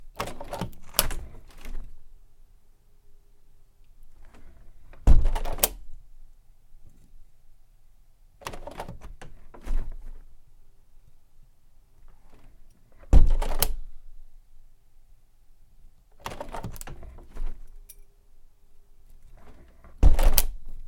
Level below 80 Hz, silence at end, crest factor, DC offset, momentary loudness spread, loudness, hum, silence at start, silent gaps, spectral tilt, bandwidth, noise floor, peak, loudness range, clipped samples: -28 dBFS; 0 s; 26 dB; under 0.1%; 26 LU; -29 LUFS; none; 0 s; none; -4 dB/octave; 16.5 kHz; -53 dBFS; 0 dBFS; 16 LU; under 0.1%